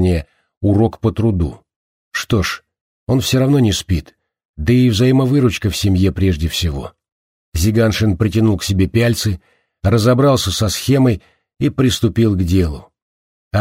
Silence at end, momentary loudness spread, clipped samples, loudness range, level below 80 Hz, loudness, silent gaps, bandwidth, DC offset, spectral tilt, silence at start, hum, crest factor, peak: 0 s; 10 LU; under 0.1%; 3 LU; -32 dBFS; -16 LUFS; 0.57-0.61 s, 1.76-2.11 s, 2.81-3.07 s, 4.45-4.54 s, 7.12-7.52 s, 13.02-13.51 s; 16 kHz; under 0.1%; -6 dB/octave; 0 s; none; 14 dB; -2 dBFS